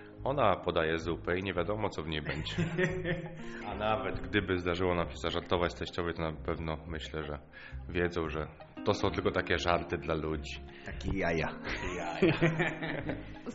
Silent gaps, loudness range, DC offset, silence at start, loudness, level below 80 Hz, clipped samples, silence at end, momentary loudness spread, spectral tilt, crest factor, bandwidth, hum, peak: none; 3 LU; under 0.1%; 0 s; -33 LUFS; -48 dBFS; under 0.1%; 0 s; 11 LU; -4.5 dB/octave; 22 dB; 7.6 kHz; none; -10 dBFS